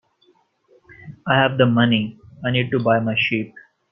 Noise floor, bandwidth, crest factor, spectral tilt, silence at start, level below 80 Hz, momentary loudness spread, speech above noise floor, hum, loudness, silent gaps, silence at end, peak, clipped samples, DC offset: -60 dBFS; 5.8 kHz; 18 dB; -9 dB/octave; 1.05 s; -56 dBFS; 14 LU; 42 dB; none; -19 LUFS; none; 0.3 s; -2 dBFS; under 0.1%; under 0.1%